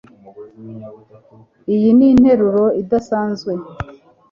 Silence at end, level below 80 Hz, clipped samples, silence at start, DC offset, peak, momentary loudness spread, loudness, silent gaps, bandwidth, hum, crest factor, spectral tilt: 0.4 s; -44 dBFS; under 0.1%; 0.4 s; under 0.1%; -2 dBFS; 24 LU; -14 LUFS; none; 7.2 kHz; none; 14 dB; -8.5 dB/octave